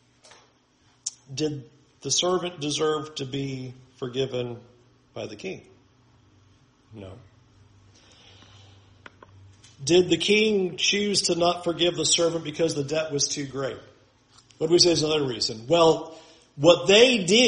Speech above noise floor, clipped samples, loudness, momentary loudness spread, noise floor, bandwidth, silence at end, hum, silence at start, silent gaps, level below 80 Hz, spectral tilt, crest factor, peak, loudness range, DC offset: 39 dB; under 0.1%; -23 LUFS; 20 LU; -62 dBFS; 10.5 kHz; 0 s; none; 1.05 s; none; -60 dBFS; -3 dB/octave; 22 dB; -4 dBFS; 15 LU; under 0.1%